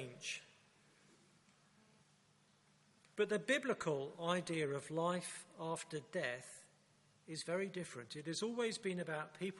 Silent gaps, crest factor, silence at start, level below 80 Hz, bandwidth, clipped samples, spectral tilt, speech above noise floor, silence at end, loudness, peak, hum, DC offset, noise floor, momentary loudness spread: none; 22 dB; 0 s; -86 dBFS; 11.5 kHz; under 0.1%; -4 dB/octave; 31 dB; 0 s; -42 LUFS; -22 dBFS; none; under 0.1%; -73 dBFS; 11 LU